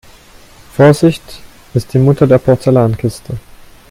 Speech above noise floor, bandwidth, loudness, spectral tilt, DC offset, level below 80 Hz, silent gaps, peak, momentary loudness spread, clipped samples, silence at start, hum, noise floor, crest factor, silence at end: 29 dB; 15.5 kHz; -11 LUFS; -7.5 dB/octave; under 0.1%; -40 dBFS; none; 0 dBFS; 17 LU; under 0.1%; 0.8 s; none; -40 dBFS; 12 dB; 0.5 s